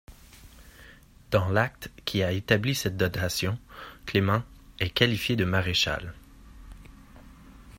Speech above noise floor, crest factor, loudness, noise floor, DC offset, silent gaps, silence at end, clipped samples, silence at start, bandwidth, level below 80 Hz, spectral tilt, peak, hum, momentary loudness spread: 25 dB; 24 dB; -27 LUFS; -52 dBFS; under 0.1%; none; 0.05 s; under 0.1%; 0.1 s; 16 kHz; -50 dBFS; -5 dB/octave; -4 dBFS; none; 12 LU